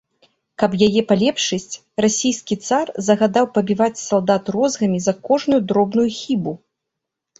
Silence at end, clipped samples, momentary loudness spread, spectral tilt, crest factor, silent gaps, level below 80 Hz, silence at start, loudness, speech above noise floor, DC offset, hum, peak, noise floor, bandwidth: 0.85 s; under 0.1%; 7 LU; -4.5 dB/octave; 18 dB; none; -58 dBFS; 0.6 s; -18 LUFS; 63 dB; under 0.1%; none; 0 dBFS; -81 dBFS; 8 kHz